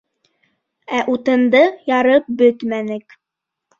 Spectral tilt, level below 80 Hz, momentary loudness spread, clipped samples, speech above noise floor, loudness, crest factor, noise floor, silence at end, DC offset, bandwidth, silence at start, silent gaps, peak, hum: -5.5 dB/octave; -64 dBFS; 10 LU; under 0.1%; 67 dB; -16 LUFS; 16 dB; -82 dBFS; 0.8 s; under 0.1%; 7.2 kHz; 0.9 s; none; -2 dBFS; none